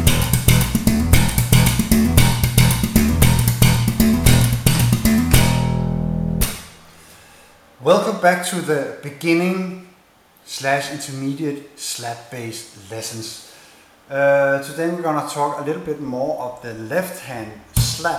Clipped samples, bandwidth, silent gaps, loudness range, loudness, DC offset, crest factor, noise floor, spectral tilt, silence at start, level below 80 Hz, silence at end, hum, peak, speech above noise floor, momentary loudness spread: under 0.1%; 17 kHz; none; 10 LU; -18 LUFS; under 0.1%; 18 dB; -52 dBFS; -5 dB/octave; 0 s; -28 dBFS; 0 s; none; 0 dBFS; 31 dB; 15 LU